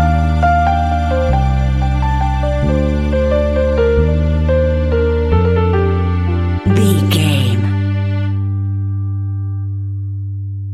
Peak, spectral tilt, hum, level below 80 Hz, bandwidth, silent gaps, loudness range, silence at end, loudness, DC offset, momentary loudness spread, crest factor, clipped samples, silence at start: 0 dBFS; -7.5 dB/octave; none; -20 dBFS; 13.5 kHz; none; 3 LU; 0 s; -15 LUFS; under 0.1%; 8 LU; 14 dB; under 0.1%; 0 s